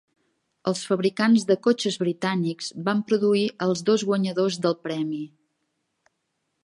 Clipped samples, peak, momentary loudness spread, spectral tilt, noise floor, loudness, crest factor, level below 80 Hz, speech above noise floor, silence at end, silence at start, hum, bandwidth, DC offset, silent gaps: under 0.1%; -8 dBFS; 9 LU; -5.5 dB/octave; -77 dBFS; -24 LUFS; 18 dB; -74 dBFS; 54 dB; 1.4 s; 0.65 s; none; 11.5 kHz; under 0.1%; none